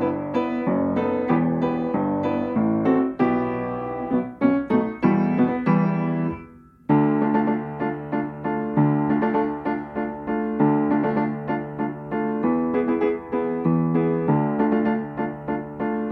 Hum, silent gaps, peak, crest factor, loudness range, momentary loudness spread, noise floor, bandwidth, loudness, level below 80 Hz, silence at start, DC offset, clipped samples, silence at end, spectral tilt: none; none; -6 dBFS; 16 dB; 2 LU; 8 LU; -45 dBFS; 4.9 kHz; -23 LUFS; -54 dBFS; 0 s; under 0.1%; under 0.1%; 0 s; -10.5 dB/octave